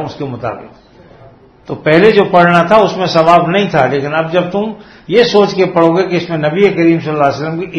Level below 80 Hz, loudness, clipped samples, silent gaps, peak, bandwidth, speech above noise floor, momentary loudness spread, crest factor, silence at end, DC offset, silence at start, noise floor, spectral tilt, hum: -48 dBFS; -11 LUFS; 0.5%; none; 0 dBFS; 9 kHz; 30 dB; 13 LU; 12 dB; 0 s; under 0.1%; 0 s; -40 dBFS; -6.5 dB/octave; none